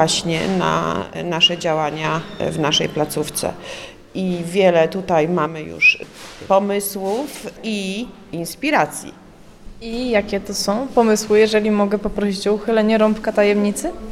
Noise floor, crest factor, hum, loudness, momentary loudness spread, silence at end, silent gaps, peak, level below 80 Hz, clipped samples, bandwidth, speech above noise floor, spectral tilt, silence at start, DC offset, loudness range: -39 dBFS; 18 dB; none; -18 LUFS; 14 LU; 0 s; none; -2 dBFS; -44 dBFS; under 0.1%; 16 kHz; 20 dB; -4 dB/octave; 0 s; 0.1%; 5 LU